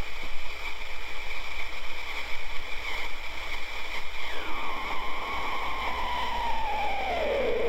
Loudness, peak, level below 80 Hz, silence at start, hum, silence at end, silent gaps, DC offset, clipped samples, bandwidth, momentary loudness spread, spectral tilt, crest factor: -33 LUFS; -14 dBFS; -38 dBFS; 0 s; none; 0 s; none; under 0.1%; under 0.1%; 14 kHz; 7 LU; -3.5 dB/octave; 10 dB